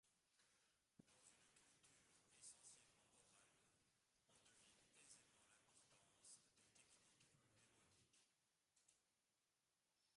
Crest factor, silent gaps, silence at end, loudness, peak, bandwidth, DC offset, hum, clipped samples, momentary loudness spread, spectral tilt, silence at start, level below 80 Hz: 26 dB; none; 0 s; -67 LUFS; -50 dBFS; 11.5 kHz; under 0.1%; none; under 0.1%; 5 LU; -1 dB/octave; 0.05 s; under -90 dBFS